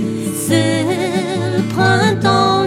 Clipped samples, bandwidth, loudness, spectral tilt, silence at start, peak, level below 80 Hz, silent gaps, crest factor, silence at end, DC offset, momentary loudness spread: under 0.1%; 16 kHz; -15 LUFS; -5 dB/octave; 0 s; 0 dBFS; -50 dBFS; none; 14 dB; 0 s; under 0.1%; 6 LU